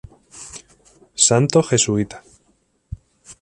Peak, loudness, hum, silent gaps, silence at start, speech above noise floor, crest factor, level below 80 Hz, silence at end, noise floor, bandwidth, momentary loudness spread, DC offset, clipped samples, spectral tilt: 0 dBFS; -17 LUFS; none; none; 0.35 s; 45 dB; 22 dB; -48 dBFS; 0.1 s; -63 dBFS; 11.5 kHz; 24 LU; under 0.1%; under 0.1%; -4 dB/octave